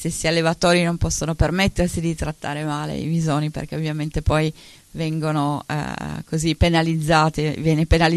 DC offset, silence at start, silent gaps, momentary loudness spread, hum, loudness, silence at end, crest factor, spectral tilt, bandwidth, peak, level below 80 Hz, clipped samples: under 0.1%; 0 s; none; 9 LU; none; -21 LUFS; 0 s; 16 dB; -5.5 dB/octave; 13 kHz; -4 dBFS; -32 dBFS; under 0.1%